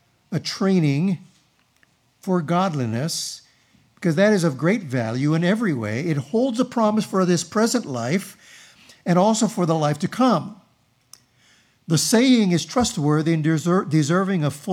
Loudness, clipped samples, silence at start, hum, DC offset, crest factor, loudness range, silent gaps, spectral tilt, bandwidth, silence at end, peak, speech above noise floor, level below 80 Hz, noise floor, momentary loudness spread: -21 LUFS; under 0.1%; 0.3 s; none; under 0.1%; 16 dB; 3 LU; none; -5.5 dB/octave; 15.5 kHz; 0 s; -6 dBFS; 42 dB; -62 dBFS; -62 dBFS; 8 LU